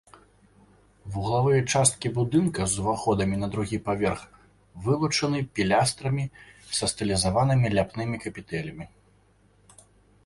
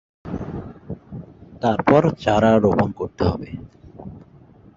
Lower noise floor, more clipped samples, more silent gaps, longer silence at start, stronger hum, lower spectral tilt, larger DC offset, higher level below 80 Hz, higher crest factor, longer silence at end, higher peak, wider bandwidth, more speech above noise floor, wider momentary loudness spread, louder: first, -61 dBFS vs -48 dBFS; neither; neither; first, 1.05 s vs 0.25 s; neither; second, -5 dB/octave vs -8 dB/octave; neither; second, -48 dBFS vs -42 dBFS; about the same, 22 dB vs 20 dB; first, 1.4 s vs 0.55 s; about the same, -4 dBFS vs -2 dBFS; first, 11.5 kHz vs 7.6 kHz; first, 36 dB vs 30 dB; second, 12 LU vs 23 LU; second, -25 LUFS vs -19 LUFS